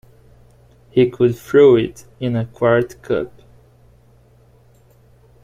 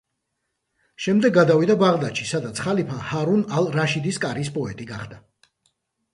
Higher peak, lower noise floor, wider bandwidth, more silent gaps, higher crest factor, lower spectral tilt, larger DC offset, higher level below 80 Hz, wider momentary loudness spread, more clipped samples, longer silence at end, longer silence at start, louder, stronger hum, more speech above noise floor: about the same, -2 dBFS vs -4 dBFS; second, -51 dBFS vs -77 dBFS; first, 15 kHz vs 11.5 kHz; neither; about the same, 18 dB vs 18 dB; first, -7.5 dB/octave vs -6 dB/octave; neither; first, -52 dBFS vs -58 dBFS; about the same, 13 LU vs 14 LU; neither; first, 2.15 s vs 0.95 s; about the same, 0.95 s vs 1 s; first, -17 LUFS vs -21 LUFS; first, 60 Hz at -40 dBFS vs none; second, 35 dB vs 56 dB